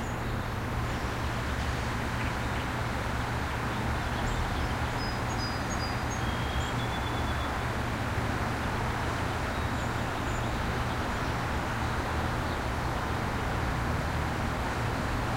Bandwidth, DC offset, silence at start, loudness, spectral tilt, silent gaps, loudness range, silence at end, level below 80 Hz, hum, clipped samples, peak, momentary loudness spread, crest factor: 16 kHz; under 0.1%; 0 s; -31 LUFS; -5.5 dB/octave; none; 1 LU; 0 s; -38 dBFS; none; under 0.1%; -16 dBFS; 1 LU; 14 dB